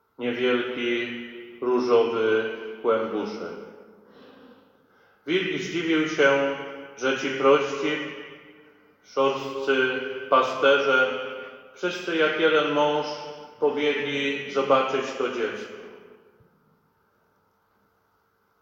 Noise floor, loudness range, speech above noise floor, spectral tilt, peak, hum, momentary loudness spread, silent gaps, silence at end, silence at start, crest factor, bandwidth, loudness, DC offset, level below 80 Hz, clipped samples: -68 dBFS; 7 LU; 44 dB; -4.5 dB/octave; -6 dBFS; none; 16 LU; none; 2.65 s; 0.2 s; 20 dB; 7.8 kHz; -24 LUFS; under 0.1%; -74 dBFS; under 0.1%